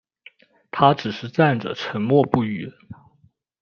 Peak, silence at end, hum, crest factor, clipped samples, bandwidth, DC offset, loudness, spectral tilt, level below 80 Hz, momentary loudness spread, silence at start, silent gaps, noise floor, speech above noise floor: 0 dBFS; 0.7 s; none; 22 dB; under 0.1%; 6.8 kHz; under 0.1%; -21 LUFS; -7.5 dB/octave; -60 dBFS; 13 LU; 0.75 s; none; -60 dBFS; 40 dB